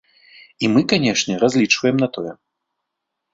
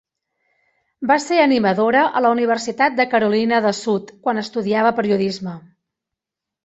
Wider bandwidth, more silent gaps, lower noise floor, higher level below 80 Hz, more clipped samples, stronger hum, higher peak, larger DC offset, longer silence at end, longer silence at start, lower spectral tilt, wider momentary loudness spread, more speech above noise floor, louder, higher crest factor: about the same, 7.8 kHz vs 8.2 kHz; neither; second, -79 dBFS vs -84 dBFS; first, -58 dBFS vs -64 dBFS; neither; neither; about the same, -2 dBFS vs -2 dBFS; neither; about the same, 1 s vs 1.05 s; second, 0.6 s vs 1 s; about the same, -4.5 dB/octave vs -5 dB/octave; about the same, 8 LU vs 8 LU; second, 62 dB vs 66 dB; about the same, -17 LUFS vs -18 LUFS; about the same, 18 dB vs 18 dB